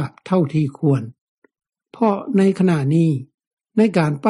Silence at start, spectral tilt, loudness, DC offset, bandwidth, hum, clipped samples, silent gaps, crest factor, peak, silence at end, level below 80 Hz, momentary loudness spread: 0 s; -8.5 dB/octave; -19 LUFS; under 0.1%; 11.5 kHz; none; under 0.1%; 1.21-1.42 s, 3.34-3.38 s, 3.47-3.57 s; 14 dB; -4 dBFS; 0 s; -62 dBFS; 7 LU